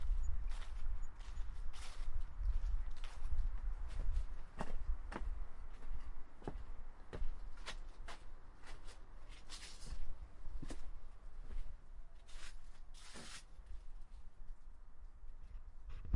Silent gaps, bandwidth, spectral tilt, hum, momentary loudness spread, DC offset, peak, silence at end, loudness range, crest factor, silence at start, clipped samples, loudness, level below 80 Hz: none; 11 kHz; -5 dB/octave; none; 15 LU; under 0.1%; -24 dBFS; 0 s; 10 LU; 16 dB; 0 s; under 0.1%; -51 LUFS; -44 dBFS